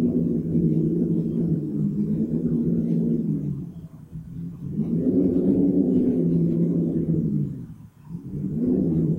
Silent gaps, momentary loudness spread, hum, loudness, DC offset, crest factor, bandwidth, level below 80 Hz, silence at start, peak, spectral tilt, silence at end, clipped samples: none; 16 LU; none; -23 LUFS; under 0.1%; 14 dB; 2 kHz; -48 dBFS; 0 s; -8 dBFS; -12.5 dB/octave; 0 s; under 0.1%